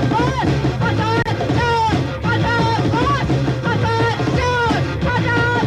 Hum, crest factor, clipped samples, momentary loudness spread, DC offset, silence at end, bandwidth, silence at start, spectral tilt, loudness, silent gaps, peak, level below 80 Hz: none; 12 dB; under 0.1%; 2 LU; under 0.1%; 0 s; 11 kHz; 0 s; -6.5 dB/octave; -17 LUFS; none; -6 dBFS; -32 dBFS